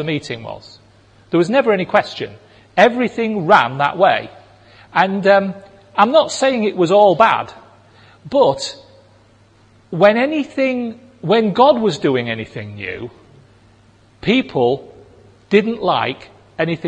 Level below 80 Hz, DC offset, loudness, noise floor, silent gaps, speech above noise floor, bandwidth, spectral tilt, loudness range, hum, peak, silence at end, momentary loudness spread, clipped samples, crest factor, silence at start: -58 dBFS; under 0.1%; -16 LUFS; -50 dBFS; none; 35 dB; 9.6 kHz; -5.5 dB/octave; 5 LU; none; 0 dBFS; 0 s; 16 LU; under 0.1%; 18 dB; 0 s